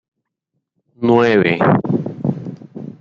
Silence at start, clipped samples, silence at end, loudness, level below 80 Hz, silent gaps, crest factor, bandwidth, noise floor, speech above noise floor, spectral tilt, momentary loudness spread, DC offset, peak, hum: 1 s; under 0.1%; 0.1 s; -16 LUFS; -56 dBFS; none; 16 dB; 7.2 kHz; -75 dBFS; 61 dB; -8.5 dB/octave; 19 LU; under 0.1%; -2 dBFS; none